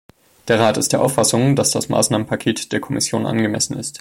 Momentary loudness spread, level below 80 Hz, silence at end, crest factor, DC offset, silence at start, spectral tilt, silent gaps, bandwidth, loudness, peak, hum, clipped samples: 6 LU; -52 dBFS; 0.05 s; 16 dB; under 0.1%; 0.45 s; -4 dB/octave; none; 16.5 kHz; -18 LUFS; -2 dBFS; none; under 0.1%